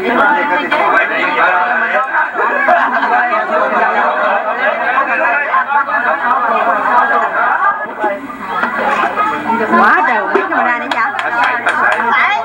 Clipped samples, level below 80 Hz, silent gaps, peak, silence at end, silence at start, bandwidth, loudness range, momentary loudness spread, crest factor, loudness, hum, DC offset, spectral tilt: under 0.1%; -58 dBFS; none; 0 dBFS; 0 s; 0 s; 16.5 kHz; 1 LU; 4 LU; 12 dB; -12 LUFS; none; under 0.1%; -4 dB/octave